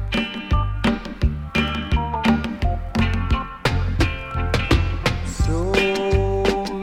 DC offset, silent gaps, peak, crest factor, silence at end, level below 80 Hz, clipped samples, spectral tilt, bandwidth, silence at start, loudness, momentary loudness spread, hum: under 0.1%; none; -4 dBFS; 18 dB; 0 s; -26 dBFS; under 0.1%; -6 dB/octave; 15 kHz; 0 s; -22 LUFS; 5 LU; none